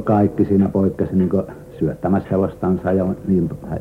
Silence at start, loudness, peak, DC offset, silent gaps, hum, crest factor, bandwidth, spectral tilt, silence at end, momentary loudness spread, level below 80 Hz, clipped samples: 0 s; -19 LUFS; -4 dBFS; under 0.1%; none; none; 14 dB; 3.7 kHz; -10.5 dB/octave; 0 s; 7 LU; -44 dBFS; under 0.1%